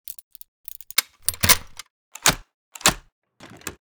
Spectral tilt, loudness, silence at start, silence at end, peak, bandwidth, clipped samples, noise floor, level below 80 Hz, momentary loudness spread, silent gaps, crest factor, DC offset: -1 dB/octave; -20 LUFS; 1 s; 0.1 s; -2 dBFS; over 20 kHz; under 0.1%; -40 dBFS; -44 dBFS; 22 LU; 1.90-2.12 s, 2.54-2.72 s, 3.12-3.22 s; 24 dB; under 0.1%